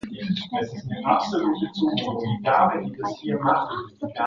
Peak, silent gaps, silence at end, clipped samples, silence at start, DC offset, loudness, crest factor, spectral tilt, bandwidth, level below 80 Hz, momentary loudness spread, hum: -6 dBFS; none; 0 s; under 0.1%; 0.05 s; under 0.1%; -24 LUFS; 18 dB; -6.5 dB/octave; 7.6 kHz; -60 dBFS; 10 LU; none